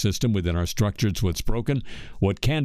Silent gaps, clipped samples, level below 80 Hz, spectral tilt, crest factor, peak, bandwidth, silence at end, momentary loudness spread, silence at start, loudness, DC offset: none; under 0.1%; -34 dBFS; -5.5 dB/octave; 18 dB; -6 dBFS; 15.5 kHz; 0 s; 5 LU; 0 s; -25 LUFS; under 0.1%